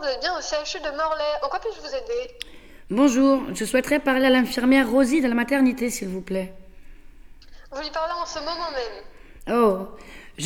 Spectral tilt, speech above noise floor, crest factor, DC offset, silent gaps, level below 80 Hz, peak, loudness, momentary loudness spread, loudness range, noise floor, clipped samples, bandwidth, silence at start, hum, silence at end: -4 dB/octave; 21 dB; 18 dB; under 0.1%; none; -46 dBFS; -6 dBFS; -23 LUFS; 18 LU; 10 LU; -43 dBFS; under 0.1%; 17.5 kHz; 0 s; none; 0 s